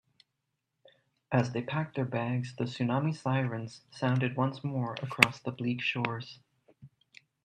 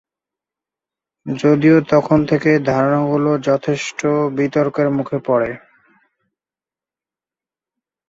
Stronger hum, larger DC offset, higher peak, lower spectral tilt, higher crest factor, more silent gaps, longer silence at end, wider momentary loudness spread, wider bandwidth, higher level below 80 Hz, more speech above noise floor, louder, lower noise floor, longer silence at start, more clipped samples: neither; neither; about the same, 0 dBFS vs -2 dBFS; about the same, -6 dB/octave vs -7 dB/octave; first, 32 dB vs 16 dB; neither; second, 0.6 s vs 2.5 s; first, 11 LU vs 8 LU; first, 13 kHz vs 7.8 kHz; second, -72 dBFS vs -54 dBFS; second, 52 dB vs over 75 dB; second, -31 LUFS vs -16 LUFS; second, -84 dBFS vs under -90 dBFS; about the same, 1.3 s vs 1.25 s; neither